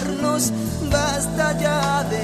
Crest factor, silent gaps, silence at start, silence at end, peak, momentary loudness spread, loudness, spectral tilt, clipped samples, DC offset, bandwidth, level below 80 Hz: 16 dB; none; 0 s; 0 s; -4 dBFS; 2 LU; -21 LUFS; -4.5 dB/octave; under 0.1%; under 0.1%; 14 kHz; -36 dBFS